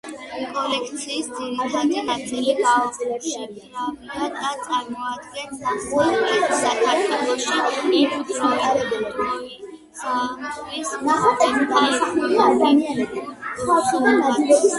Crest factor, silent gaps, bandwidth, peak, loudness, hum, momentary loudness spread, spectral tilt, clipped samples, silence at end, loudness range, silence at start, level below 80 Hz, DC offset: 18 dB; none; 11.5 kHz; -4 dBFS; -21 LUFS; none; 12 LU; -3 dB/octave; under 0.1%; 0 s; 5 LU; 0.05 s; -58 dBFS; under 0.1%